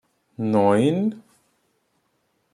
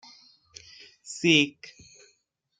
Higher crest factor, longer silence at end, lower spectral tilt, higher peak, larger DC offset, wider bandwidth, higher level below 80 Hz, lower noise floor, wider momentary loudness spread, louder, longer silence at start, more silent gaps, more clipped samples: second, 18 dB vs 24 dB; first, 1.35 s vs 1.1 s; first, -7.5 dB/octave vs -3.5 dB/octave; about the same, -6 dBFS vs -6 dBFS; neither; first, 10.5 kHz vs 9.4 kHz; about the same, -68 dBFS vs -70 dBFS; about the same, -70 dBFS vs -71 dBFS; second, 12 LU vs 27 LU; about the same, -21 LUFS vs -23 LUFS; second, 0.4 s vs 1.1 s; neither; neither